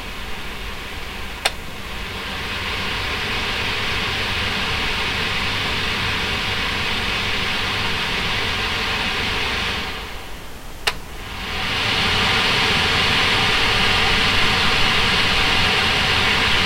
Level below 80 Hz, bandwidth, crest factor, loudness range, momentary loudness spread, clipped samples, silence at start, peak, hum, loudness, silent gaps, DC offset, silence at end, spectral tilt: -32 dBFS; 16 kHz; 20 dB; 7 LU; 14 LU; under 0.1%; 0 s; 0 dBFS; none; -18 LUFS; none; under 0.1%; 0 s; -3 dB/octave